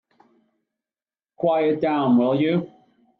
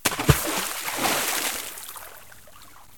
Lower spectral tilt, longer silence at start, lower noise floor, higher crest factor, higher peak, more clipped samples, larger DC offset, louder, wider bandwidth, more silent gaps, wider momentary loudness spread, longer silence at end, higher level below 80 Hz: first, -10 dB/octave vs -3 dB/octave; first, 1.4 s vs 0.05 s; first, under -90 dBFS vs -49 dBFS; second, 14 dB vs 26 dB; second, -10 dBFS vs -2 dBFS; neither; second, under 0.1% vs 0.4%; first, -21 LUFS vs -24 LUFS; second, 4.5 kHz vs 18 kHz; neither; second, 7 LU vs 18 LU; first, 0.55 s vs 0.15 s; second, -68 dBFS vs -42 dBFS